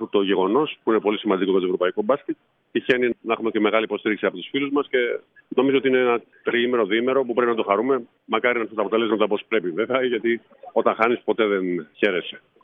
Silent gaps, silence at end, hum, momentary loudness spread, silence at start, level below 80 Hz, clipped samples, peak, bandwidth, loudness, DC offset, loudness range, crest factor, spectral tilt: none; 0.25 s; none; 6 LU; 0 s; -74 dBFS; under 0.1%; -2 dBFS; 3.9 kHz; -22 LUFS; under 0.1%; 2 LU; 18 dB; -7.5 dB/octave